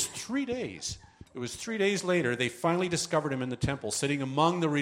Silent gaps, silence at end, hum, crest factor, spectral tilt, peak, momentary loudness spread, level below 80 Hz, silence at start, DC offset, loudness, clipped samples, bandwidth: none; 0 s; none; 18 dB; -4.5 dB/octave; -12 dBFS; 11 LU; -56 dBFS; 0 s; under 0.1%; -30 LUFS; under 0.1%; 16 kHz